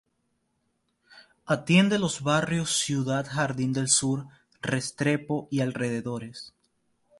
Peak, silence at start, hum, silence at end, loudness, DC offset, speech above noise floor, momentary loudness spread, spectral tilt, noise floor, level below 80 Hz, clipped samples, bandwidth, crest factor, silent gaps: -8 dBFS; 1.15 s; none; 0.7 s; -26 LUFS; under 0.1%; 48 dB; 13 LU; -4 dB/octave; -75 dBFS; -62 dBFS; under 0.1%; 11.5 kHz; 20 dB; none